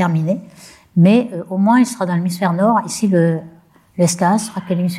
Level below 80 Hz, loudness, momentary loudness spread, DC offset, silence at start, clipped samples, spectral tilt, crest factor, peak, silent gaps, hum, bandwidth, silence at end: -62 dBFS; -16 LUFS; 9 LU; under 0.1%; 0 s; under 0.1%; -6.5 dB/octave; 14 dB; -2 dBFS; none; none; 14.5 kHz; 0 s